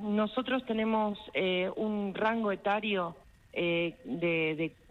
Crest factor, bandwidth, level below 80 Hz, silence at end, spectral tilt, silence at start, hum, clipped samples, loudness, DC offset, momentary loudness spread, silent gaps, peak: 16 dB; 6 kHz; -64 dBFS; 0.2 s; -7.5 dB/octave; 0 s; none; under 0.1%; -32 LUFS; under 0.1%; 4 LU; none; -16 dBFS